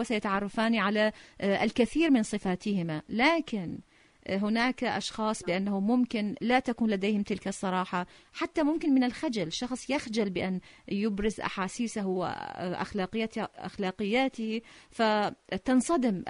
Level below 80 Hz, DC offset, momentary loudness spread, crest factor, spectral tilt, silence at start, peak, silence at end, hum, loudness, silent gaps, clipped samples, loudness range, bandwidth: -58 dBFS; under 0.1%; 9 LU; 18 dB; -5 dB/octave; 0 s; -12 dBFS; 0 s; none; -30 LUFS; none; under 0.1%; 4 LU; 11 kHz